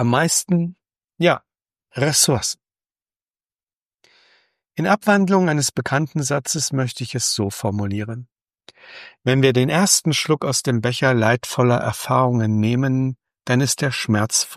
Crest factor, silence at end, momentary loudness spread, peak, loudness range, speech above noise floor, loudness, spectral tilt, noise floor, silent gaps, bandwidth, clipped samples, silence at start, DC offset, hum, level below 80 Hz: 18 dB; 0 s; 10 LU; -2 dBFS; 5 LU; over 71 dB; -19 LUFS; -4 dB/octave; under -90 dBFS; 3.16-3.26 s, 3.73-3.99 s; 15.5 kHz; under 0.1%; 0 s; under 0.1%; none; -58 dBFS